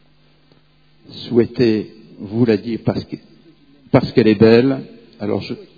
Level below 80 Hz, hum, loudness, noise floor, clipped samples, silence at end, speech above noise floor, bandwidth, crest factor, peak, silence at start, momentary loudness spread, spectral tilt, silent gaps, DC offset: -50 dBFS; none; -17 LUFS; -55 dBFS; under 0.1%; 0.15 s; 39 dB; 5 kHz; 18 dB; 0 dBFS; 1.1 s; 22 LU; -9 dB/octave; none; 0.1%